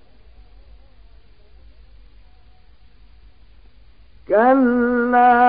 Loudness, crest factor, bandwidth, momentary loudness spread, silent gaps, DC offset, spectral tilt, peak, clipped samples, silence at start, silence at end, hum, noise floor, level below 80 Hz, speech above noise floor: -16 LUFS; 18 dB; 5 kHz; 4 LU; none; 0.4%; -10 dB/octave; -2 dBFS; under 0.1%; 4.3 s; 0 s; none; -51 dBFS; -48 dBFS; 37 dB